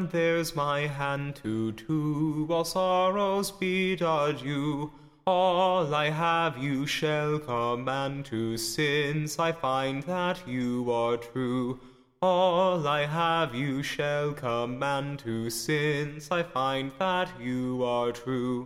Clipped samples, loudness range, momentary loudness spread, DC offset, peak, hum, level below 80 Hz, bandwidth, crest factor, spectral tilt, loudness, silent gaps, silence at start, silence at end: under 0.1%; 3 LU; 7 LU; under 0.1%; -12 dBFS; none; -58 dBFS; 16 kHz; 16 dB; -5 dB/octave; -28 LUFS; none; 0 s; 0 s